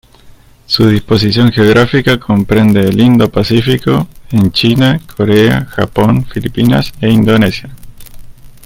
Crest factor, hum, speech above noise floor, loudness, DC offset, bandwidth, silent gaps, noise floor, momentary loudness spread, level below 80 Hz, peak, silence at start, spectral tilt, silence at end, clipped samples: 10 dB; none; 29 dB; -10 LUFS; under 0.1%; 16.5 kHz; none; -39 dBFS; 6 LU; -34 dBFS; 0 dBFS; 0.25 s; -7 dB/octave; 0.15 s; under 0.1%